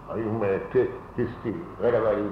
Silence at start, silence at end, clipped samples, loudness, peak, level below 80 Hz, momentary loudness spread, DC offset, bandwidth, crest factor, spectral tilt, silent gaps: 0 s; 0 s; under 0.1%; -27 LUFS; -12 dBFS; -50 dBFS; 8 LU; under 0.1%; 5.6 kHz; 14 dB; -9.5 dB/octave; none